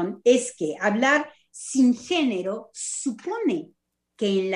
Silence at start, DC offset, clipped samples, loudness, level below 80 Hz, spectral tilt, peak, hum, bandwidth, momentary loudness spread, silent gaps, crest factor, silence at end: 0 s; under 0.1%; under 0.1%; -24 LUFS; -72 dBFS; -4 dB/octave; -6 dBFS; none; 11 kHz; 11 LU; none; 18 dB; 0 s